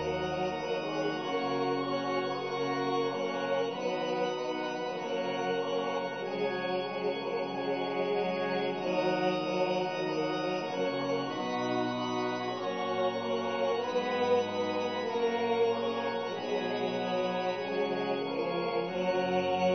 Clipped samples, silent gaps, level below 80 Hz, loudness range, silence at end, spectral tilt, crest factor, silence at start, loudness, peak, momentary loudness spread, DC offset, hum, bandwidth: under 0.1%; none; -68 dBFS; 2 LU; 0 s; -5.5 dB/octave; 14 dB; 0 s; -32 LUFS; -18 dBFS; 4 LU; under 0.1%; none; 6.2 kHz